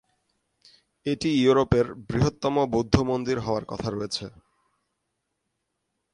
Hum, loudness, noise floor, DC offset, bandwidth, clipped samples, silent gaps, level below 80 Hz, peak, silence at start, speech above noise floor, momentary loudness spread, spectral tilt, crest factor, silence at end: none; -25 LUFS; -79 dBFS; under 0.1%; 11 kHz; under 0.1%; none; -44 dBFS; -4 dBFS; 1.05 s; 55 dB; 11 LU; -6.5 dB/octave; 24 dB; 1.85 s